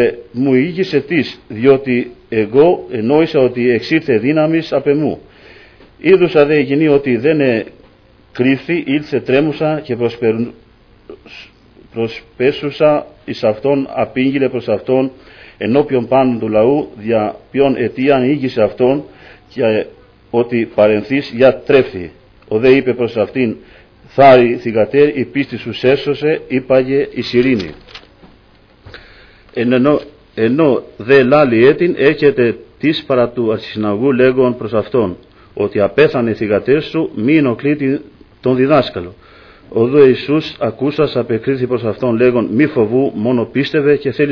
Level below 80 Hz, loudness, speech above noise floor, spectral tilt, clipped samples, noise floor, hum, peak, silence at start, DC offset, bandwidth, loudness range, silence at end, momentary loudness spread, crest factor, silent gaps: -48 dBFS; -14 LUFS; 34 dB; -8.5 dB/octave; under 0.1%; -47 dBFS; none; 0 dBFS; 0 s; under 0.1%; 5.4 kHz; 5 LU; 0 s; 9 LU; 14 dB; none